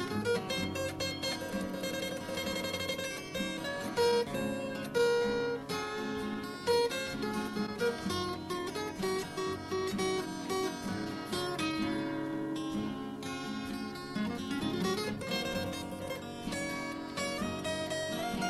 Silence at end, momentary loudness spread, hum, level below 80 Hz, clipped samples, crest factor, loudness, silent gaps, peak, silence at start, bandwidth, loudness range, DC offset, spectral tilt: 0 s; 8 LU; none; -60 dBFS; under 0.1%; 16 dB; -35 LUFS; none; -18 dBFS; 0 s; 14.5 kHz; 3 LU; under 0.1%; -4 dB/octave